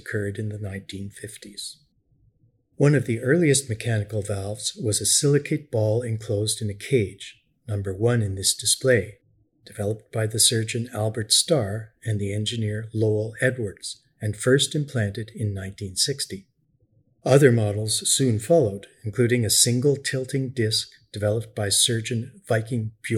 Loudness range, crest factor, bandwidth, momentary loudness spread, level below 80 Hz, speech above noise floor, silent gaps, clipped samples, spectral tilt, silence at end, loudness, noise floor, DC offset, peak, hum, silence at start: 4 LU; 22 dB; 16 kHz; 14 LU; -60 dBFS; 41 dB; none; under 0.1%; -4 dB/octave; 0 s; -23 LUFS; -64 dBFS; under 0.1%; -2 dBFS; none; 0.05 s